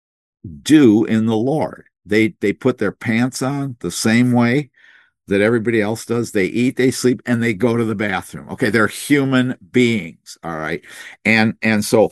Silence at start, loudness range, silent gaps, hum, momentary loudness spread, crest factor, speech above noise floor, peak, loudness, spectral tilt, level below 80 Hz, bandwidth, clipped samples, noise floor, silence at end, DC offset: 0.45 s; 2 LU; none; none; 11 LU; 18 dB; 34 dB; 0 dBFS; -17 LUFS; -5.5 dB/octave; -58 dBFS; 12.5 kHz; under 0.1%; -51 dBFS; 0 s; under 0.1%